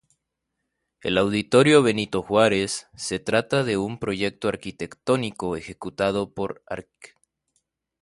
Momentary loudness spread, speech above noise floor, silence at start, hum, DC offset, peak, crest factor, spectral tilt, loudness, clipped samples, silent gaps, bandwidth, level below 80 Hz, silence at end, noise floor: 14 LU; 57 dB; 1.05 s; none; under 0.1%; -4 dBFS; 20 dB; -5 dB/octave; -23 LUFS; under 0.1%; none; 11.5 kHz; -54 dBFS; 0.95 s; -80 dBFS